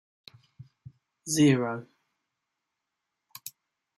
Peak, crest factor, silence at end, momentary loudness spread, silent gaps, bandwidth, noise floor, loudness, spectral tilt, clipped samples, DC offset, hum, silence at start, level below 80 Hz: -10 dBFS; 22 dB; 0.5 s; 22 LU; none; 15 kHz; -84 dBFS; -26 LUFS; -5 dB/octave; under 0.1%; under 0.1%; none; 1.25 s; -70 dBFS